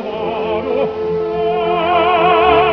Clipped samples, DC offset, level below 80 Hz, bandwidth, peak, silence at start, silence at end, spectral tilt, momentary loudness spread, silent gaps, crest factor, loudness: under 0.1%; under 0.1%; -42 dBFS; 5.4 kHz; 0 dBFS; 0 s; 0 s; -7 dB/octave; 8 LU; none; 14 dB; -15 LUFS